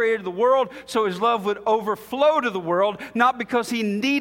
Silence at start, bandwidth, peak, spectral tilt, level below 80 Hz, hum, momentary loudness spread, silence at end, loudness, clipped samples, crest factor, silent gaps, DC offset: 0 s; 17 kHz; -4 dBFS; -5 dB/octave; -64 dBFS; none; 5 LU; 0 s; -22 LUFS; under 0.1%; 18 dB; none; under 0.1%